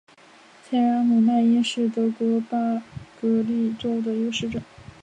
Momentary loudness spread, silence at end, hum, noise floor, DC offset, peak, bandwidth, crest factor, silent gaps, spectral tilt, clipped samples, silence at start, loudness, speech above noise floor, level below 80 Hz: 10 LU; 0.2 s; none; -51 dBFS; under 0.1%; -12 dBFS; 9.2 kHz; 12 dB; none; -6 dB/octave; under 0.1%; 0.7 s; -23 LUFS; 29 dB; -58 dBFS